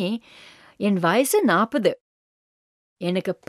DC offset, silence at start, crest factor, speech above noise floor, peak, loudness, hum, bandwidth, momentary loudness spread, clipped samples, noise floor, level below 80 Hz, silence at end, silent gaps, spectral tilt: under 0.1%; 0 s; 18 dB; over 68 dB; -6 dBFS; -22 LUFS; none; 15 kHz; 12 LU; under 0.1%; under -90 dBFS; -72 dBFS; 0.15 s; 2.01-2.96 s; -5 dB/octave